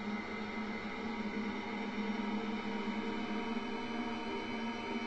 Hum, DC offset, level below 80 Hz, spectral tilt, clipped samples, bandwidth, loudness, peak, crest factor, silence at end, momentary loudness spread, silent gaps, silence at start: none; 0.2%; -64 dBFS; -5.5 dB/octave; under 0.1%; 8.4 kHz; -39 LUFS; -26 dBFS; 12 dB; 0 s; 2 LU; none; 0 s